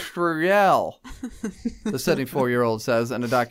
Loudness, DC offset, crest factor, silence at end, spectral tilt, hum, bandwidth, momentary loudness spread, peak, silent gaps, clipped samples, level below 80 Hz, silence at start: -23 LUFS; under 0.1%; 16 dB; 0 s; -5.5 dB/octave; none; 16 kHz; 15 LU; -8 dBFS; none; under 0.1%; -50 dBFS; 0 s